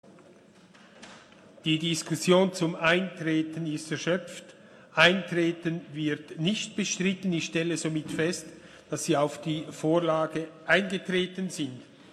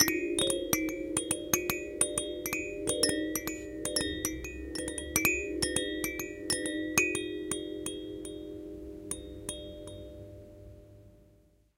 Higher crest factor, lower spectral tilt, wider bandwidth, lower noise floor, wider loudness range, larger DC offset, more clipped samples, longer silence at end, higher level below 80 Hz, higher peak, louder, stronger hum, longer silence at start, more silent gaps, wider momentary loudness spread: about the same, 22 dB vs 26 dB; first, -4.5 dB/octave vs -2.5 dB/octave; second, 13.5 kHz vs 16.5 kHz; second, -55 dBFS vs -64 dBFS; second, 3 LU vs 11 LU; neither; neither; second, 0.3 s vs 0.55 s; second, -68 dBFS vs -52 dBFS; about the same, -6 dBFS vs -8 dBFS; first, -28 LUFS vs -32 LUFS; neither; first, 0.95 s vs 0 s; neither; second, 12 LU vs 16 LU